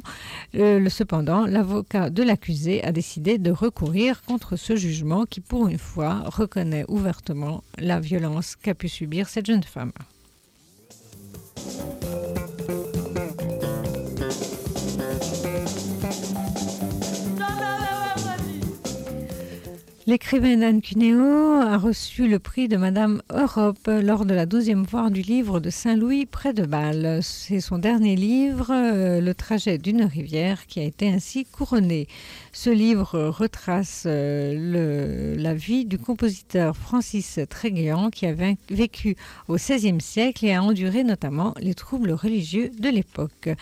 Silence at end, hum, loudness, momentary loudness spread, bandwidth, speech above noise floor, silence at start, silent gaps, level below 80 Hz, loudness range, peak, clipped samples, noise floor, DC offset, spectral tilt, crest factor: 0 s; none; -24 LUFS; 10 LU; 16 kHz; 35 dB; 0.05 s; none; -44 dBFS; 8 LU; -10 dBFS; under 0.1%; -57 dBFS; under 0.1%; -6 dB/octave; 14 dB